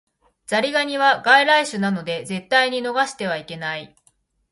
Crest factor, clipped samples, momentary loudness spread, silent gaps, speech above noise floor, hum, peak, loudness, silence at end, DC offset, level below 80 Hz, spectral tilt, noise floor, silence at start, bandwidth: 20 dB; under 0.1%; 14 LU; none; 43 dB; none; 0 dBFS; -19 LUFS; 0.65 s; under 0.1%; -66 dBFS; -3.5 dB/octave; -63 dBFS; 0.5 s; 11.5 kHz